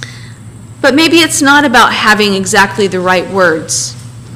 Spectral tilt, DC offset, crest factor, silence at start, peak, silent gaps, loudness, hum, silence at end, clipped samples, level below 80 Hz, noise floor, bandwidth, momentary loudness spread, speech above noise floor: -3 dB/octave; under 0.1%; 10 dB; 0 s; 0 dBFS; none; -8 LUFS; none; 0 s; under 0.1%; -42 dBFS; -30 dBFS; 16.5 kHz; 8 LU; 21 dB